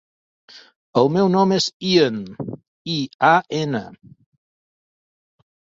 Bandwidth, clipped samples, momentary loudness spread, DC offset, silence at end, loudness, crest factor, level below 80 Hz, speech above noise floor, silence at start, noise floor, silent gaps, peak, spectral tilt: 7.8 kHz; under 0.1%; 16 LU; under 0.1%; 1.9 s; -19 LUFS; 20 dB; -62 dBFS; over 71 dB; 0.55 s; under -90 dBFS; 0.76-0.93 s, 1.74-1.80 s, 2.68-2.85 s, 3.14-3.19 s; -2 dBFS; -5.5 dB/octave